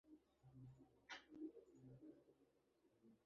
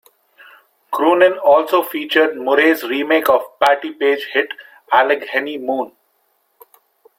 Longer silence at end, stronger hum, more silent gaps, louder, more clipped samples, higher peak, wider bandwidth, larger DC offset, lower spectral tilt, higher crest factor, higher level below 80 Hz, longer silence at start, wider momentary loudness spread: second, 0 s vs 1.3 s; neither; neither; second, -61 LUFS vs -16 LUFS; neither; second, -42 dBFS vs -2 dBFS; second, 7.2 kHz vs 16.5 kHz; neither; about the same, -4.5 dB/octave vs -3.5 dB/octave; first, 22 dB vs 16 dB; second, -88 dBFS vs -64 dBFS; second, 0.05 s vs 0.9 s; about the same, 9 LU vs 10 LU